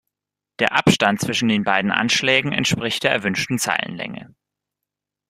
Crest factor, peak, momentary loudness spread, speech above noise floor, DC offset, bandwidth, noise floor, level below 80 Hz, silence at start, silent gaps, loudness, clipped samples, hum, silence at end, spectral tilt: 22 dB; 0 dBFS; 8 LU; 66 dB; under 0.1%; 15.5 kHz; -86 dBFS; -56 dBFS; 0.6 s; none; -19 LUFS; under 0.1%; 50 Hz at -45 dBFS; 1.05 s; -3.5 dB/octave